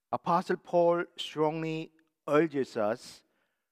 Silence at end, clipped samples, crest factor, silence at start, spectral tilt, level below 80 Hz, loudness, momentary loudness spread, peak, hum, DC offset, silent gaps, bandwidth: 0.55 s; under 0.1%; 20 dB; 0.1 s; -6 dB/octave; -82 dBFS; -30 LUFS; 13 LU; -12 dBFS; none; under 0.1%; none; 13.5 kHz